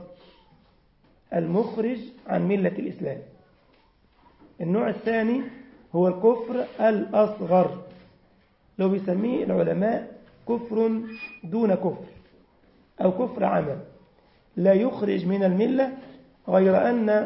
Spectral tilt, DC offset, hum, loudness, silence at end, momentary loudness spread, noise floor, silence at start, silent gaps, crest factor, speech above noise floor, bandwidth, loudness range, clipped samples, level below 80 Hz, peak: -12 dB/octave; under 0.1%; none; -24 LUFS; 0 s; 14 LU; -61 dBFS; 0 s; none; 18 dB; 37 dB; 5.8 kHz; 5 LU; under 0.1%; -64 dBFS; -8 dBFS